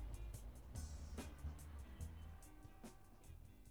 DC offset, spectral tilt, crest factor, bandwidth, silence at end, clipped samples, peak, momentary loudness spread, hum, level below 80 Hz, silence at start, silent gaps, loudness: under 0.1%; -5.5 dB/octave; 16 dB; over 20 kHz; 0 s; under 0.1%; -38 dBFS; 10 LU; none; -54 dBFS; 0 s; none; -56 LUFS